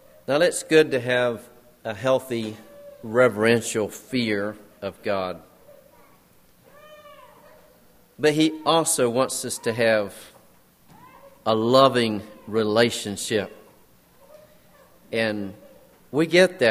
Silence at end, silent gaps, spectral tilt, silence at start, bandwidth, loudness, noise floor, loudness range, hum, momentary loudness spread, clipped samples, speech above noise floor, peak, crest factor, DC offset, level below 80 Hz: 0 s; none; -4 dB/octave; 0.3 s; 15.5 kHz; -22 LUFS; -56 dBFS; 8 LU; none; 16 LU; under 0.1%; 34 dB; -2 dBFS; 22 dB; under 0.1%; -64 dBFS